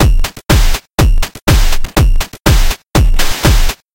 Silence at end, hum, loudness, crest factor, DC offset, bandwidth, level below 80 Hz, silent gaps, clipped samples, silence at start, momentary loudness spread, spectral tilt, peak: 0.2 s; none; -13 LUFS; 10 dB; 0.7%; 17 kHz; -12 dBFS; 1.42-1.46 s; under 0.1%; 0 s; 3 LU; -4.5 dB/octave; 0 dBFS